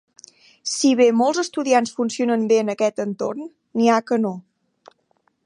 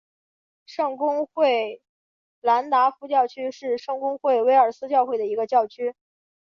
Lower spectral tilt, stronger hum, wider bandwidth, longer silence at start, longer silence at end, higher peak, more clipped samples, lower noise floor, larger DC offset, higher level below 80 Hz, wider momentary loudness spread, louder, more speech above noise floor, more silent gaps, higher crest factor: about the same, -4 dB/octave vs -4 dB/octave; neither; first, 11.5 kHz vs 7 kHz; about the same, 0.65 s vs 0.7 s; first, 1.05 s vs 0.6 s; about the same, -4 dBFS vs -6 dBFS; neither; second, -66 dBFS vs under -90 dBFS; neither; about the same, -76 dBFS vs -78 dBFS; about the same, 12 LU vs 10 LU; first, -20 LUFS vs -23 LUFS; second, 47 dB vs over 68 dB; second, none vs 1.89-2.42 s; about the same, 16 dB vs 18 dB